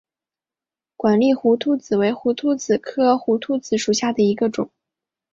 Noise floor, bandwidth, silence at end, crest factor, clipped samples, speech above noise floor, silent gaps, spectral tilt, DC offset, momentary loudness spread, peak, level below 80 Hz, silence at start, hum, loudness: under -90 dBFS; 7.8 kHz; 0.65 s; 16 dB; under 0.1%; over 71 dB; none; -5 dB/octave; under 0.1%; 6 LU; -4 dBFS; -62 dBFS; 1 s; none; -20 LUFS